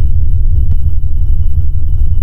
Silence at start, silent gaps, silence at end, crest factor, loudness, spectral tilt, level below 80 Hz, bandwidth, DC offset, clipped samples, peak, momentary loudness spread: 0 s; none; 0 s; 6 dB; -16 LUFS; -10.5 dB/octave; -10 dBFS; 0.8 kHz; under 0.1%; 0.6%; 0 dBFS; 3 LU